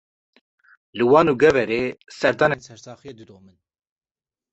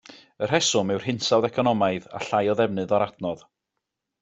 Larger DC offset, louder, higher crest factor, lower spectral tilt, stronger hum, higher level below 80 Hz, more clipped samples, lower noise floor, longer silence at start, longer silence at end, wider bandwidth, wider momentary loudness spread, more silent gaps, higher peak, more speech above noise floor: neither; first, -19 LUFS vs -24 LUFS; about the same, 20 dB vs 20 dB; first, -6 dB/octave vs -4 dB/octave; neither; first, -56 dBFS vs -64 dBFS; neither; first, under -90 dBFS vs -83 dBFS; first, 0.95 s vs 0.1 s; first, 1.3 s vs 0.85 s; about the same, 8.2 kHz vs 8.2 kHz; first, 24 LU vs 10 LU; neither; about the same, -2 dBFS vs -4 dBFS; first, over 70 dB vs 59 dB